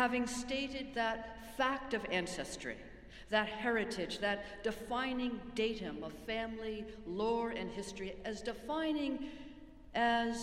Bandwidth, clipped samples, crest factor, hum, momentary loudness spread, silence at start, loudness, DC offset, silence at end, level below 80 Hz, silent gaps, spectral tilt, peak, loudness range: 15.5 kHz; under 0.1%; 22 dB; none; 10 LU; 0 s; -38 LUFS; under 0.1%; 0 s; -58 dBFS; none; -4 dB/octave; -16 dBFS; 3 LU